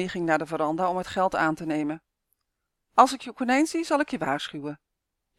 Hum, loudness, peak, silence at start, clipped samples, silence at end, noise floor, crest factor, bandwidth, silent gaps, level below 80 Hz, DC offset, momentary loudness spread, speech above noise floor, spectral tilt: none; -25 LUFS; -2 dBFS; 0 s; under 0.1%; 0.65 s; -82 dBFS; 24 dB; 14.5 kHz; none; -62 dBFS; under 0.1%; 13 LU; 56 dB; -4.5 dB/octave